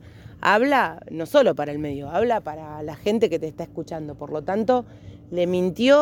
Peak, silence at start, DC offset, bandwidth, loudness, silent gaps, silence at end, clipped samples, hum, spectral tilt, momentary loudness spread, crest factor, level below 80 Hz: -4 dBFS; 0.05 s; under 0.1%; 17 kHz; -23 LUFS; none; 0 s; under 0.1%; none; -6 dB/octave; 14 LU; 18 dB; -54 dBFS